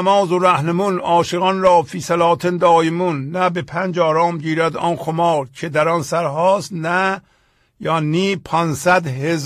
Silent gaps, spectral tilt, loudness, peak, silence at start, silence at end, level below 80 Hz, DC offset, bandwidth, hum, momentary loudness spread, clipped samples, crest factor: none; -5.5 dB/octave; -17 LUFS; -2 dBFS; 0 s; 0 s; -54 dBFS; under 0.1%; 15 kHz; none; 7 LU; under 0.1%; 14 dB